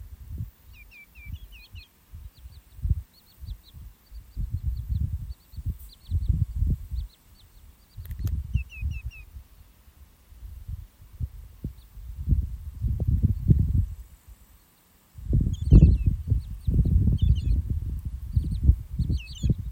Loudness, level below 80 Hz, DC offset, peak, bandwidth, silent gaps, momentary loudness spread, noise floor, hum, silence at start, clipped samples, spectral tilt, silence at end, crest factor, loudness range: -27 LUFS; -30 dBFS; under 0.1%; -2 dBFS; 16 kHz; none; 23 LU; -60 dBFS; none; 0 s; under 0.1%; -8.5 dB/octave; 0 s; 24 dB; 15 LU